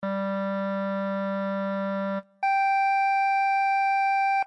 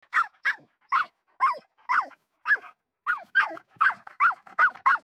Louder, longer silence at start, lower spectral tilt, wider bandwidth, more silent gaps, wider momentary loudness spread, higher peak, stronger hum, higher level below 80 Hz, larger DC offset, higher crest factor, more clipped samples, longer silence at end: about the same, -25 LUFS vs -25 LUFS; second, 0 s vs 0.15 s; first, -7 dB/octave vs -1 dB/octave; second, 9.2 kHz vs 13.5 kHz; neither; second, 6 LU vs 11 LU; second, -20 dBFS vs -10 dBFS; neither; second, -86 dBFS vs -80 dBFS; neither; second, 6 dB vs 18 dB; neither; about the same, 0 s vs 0.05 s